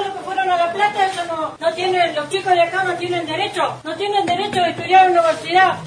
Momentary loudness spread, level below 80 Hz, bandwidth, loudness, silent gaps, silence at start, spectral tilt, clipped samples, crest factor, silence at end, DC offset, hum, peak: 8 LU; -60 dBFS; 10.5 kHz; -18 LUFS; none; 0 s; -4 dB/octave; under 0.1%; 16 dB; 0 s; under 0.1%; none; -2 dBFS